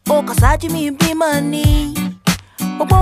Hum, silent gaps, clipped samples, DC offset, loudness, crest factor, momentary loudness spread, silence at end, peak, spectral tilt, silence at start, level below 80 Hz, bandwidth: none; none; under 0.1%; under 0.1%; -16 LUFS; 14 dB; 7 LU; 0 s; 0 dBFS; -5.5 dB/octave; 0.05 s; -22 dBFS; 15.5 kHz